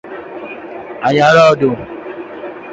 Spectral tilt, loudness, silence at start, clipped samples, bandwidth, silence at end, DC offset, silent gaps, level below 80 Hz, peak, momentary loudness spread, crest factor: -5.5 dB/octave; -11 LUFS; 0.05 s; under 0.1%; 7.8 kHz; 0 s; under 0.1%; none; -50 dBFS; 0 dBFS; 20 LU; 14 dB